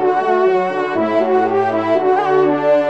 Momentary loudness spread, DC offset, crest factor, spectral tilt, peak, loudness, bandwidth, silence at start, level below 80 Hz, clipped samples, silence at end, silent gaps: 3 LU; 0.3%; 12 dB; -7 dB/octave; -4 dBFS; -15 LUFS; 7.4 kHz; 0 s; -68 dBFS; under 0.1%; 0 s; none